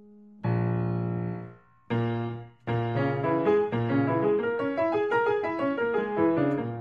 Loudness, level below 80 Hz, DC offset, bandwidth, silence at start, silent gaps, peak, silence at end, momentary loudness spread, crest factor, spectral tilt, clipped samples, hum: -27 LUFS; -62 dBFS; under 0.1%; 5.4 kHz; 0.1 s; none; -12 dBFS; 0 s; 8 LU; 16 dB; -9.5 dB/octave; under 0.1%; none